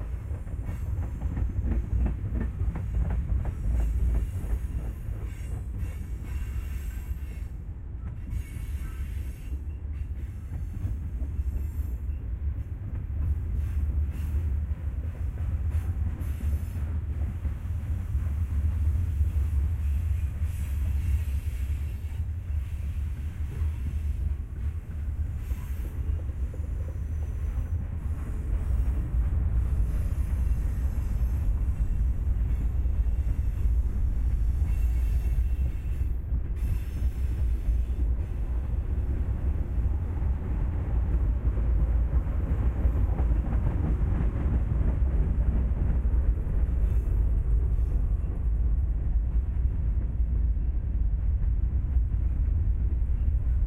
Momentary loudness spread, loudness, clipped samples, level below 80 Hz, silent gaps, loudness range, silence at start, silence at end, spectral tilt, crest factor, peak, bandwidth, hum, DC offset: 8 LU; -30 LUFS; under 0.1%; -28 dBFS; none; 7 LU; 0 s; 0 s; -8.5 dB/octave; 14 dB; -12 dBFS; 3.4 kHz; none; under 0.1%